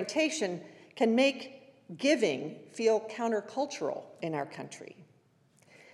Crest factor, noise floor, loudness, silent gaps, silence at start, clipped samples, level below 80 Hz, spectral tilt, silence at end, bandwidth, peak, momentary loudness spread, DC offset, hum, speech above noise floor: 20 dB; -66 dBFS; -31 LUFS; none; 0 s; under 0.1%; under -90 dBFS; -4 dB/octave; 0.9 s; 12 kHz; -12 dBFS; 18 LU; under 0.1%; none; 35 dB